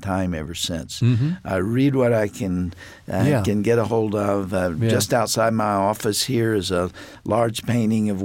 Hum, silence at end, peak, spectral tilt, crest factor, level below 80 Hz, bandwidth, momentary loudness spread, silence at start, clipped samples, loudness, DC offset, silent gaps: none; 0 s; -6 dBFS; -5.5 dB/octave; 14 dB; -48 dBFS; 17 kHz; 7 LU; 0 s; under 0.1%; -21 LUFS; under 0.1%; none